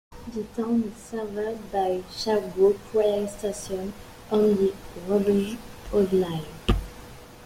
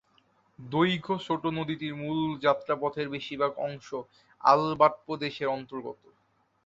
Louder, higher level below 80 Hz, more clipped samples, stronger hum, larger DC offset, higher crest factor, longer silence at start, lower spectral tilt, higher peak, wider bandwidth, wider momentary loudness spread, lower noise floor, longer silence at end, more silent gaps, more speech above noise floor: about the same, -26 LUFS vs -28 LUFS; first, -40 dBFS vs -68 dBFS; neither; neither; neither; second, 18 dB vs 24 dB; second, 0.1 s vs 0.6 s; about the same, -6 dB/octave vs -6.5 dB/octave; about the same, -6 dBFS vs -6 dBFS; first, 16 kHz vs 7.8 kHz; about the same, 15 LU vs 14 LU; second, -44 dBFS vs -70 dBFS; second, 0 s vs 0.7 s; neither; second, 19 dB vs 42 dB